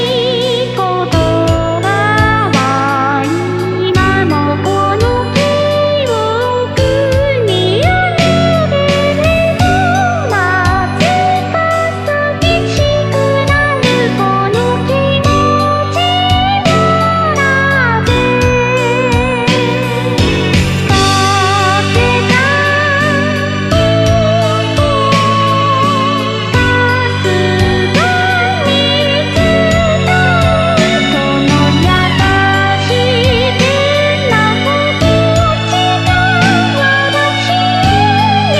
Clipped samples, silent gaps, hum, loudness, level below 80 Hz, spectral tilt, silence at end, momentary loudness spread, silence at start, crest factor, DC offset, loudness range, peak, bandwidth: under 0.1%; none; none; -11 LUFS; -30 dBFS; -5.5 dB/octave; 0 s; 3 LU; 0 s; 10 dB; 0.1%; 2 LU; 0 dBFS; 14 kHz